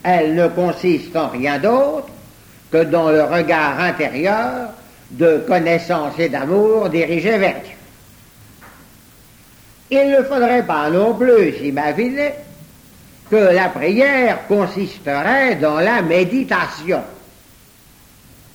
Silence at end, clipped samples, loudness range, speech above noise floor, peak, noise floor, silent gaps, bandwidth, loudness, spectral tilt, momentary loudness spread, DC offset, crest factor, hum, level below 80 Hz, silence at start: 1.4 s; under 0.1%; 4 LU; 31 dB; -2 dBFS; -47 dBFS; none; over 20 kHz; -16 LUFS; -6.5 dB/octave; 8 LU; under 0.1%; 14 dB; none; -52 dBFS; 0.05 s